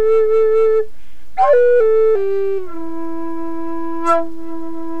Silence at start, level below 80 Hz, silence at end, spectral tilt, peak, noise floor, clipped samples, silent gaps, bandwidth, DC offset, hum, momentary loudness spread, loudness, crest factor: 0 s; -50 dBFS; 0 s; -6.5 dB/octave; -4 dBFS; -45 dBFS; under 0.1%; none; 8.6 kHz; 10%; none; 16 LU; -16 LUFS; 12 dB